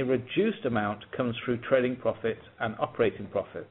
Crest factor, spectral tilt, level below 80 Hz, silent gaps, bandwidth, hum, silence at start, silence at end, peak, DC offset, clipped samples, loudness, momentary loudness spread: 18 dB; -5 dB/octave; -62 dBFS; none; 4.1 kHz; none; 0 s; 0.05 s; -10 dBFS; under 0.1%; under 0.1%; -30 LUFS; 8 LU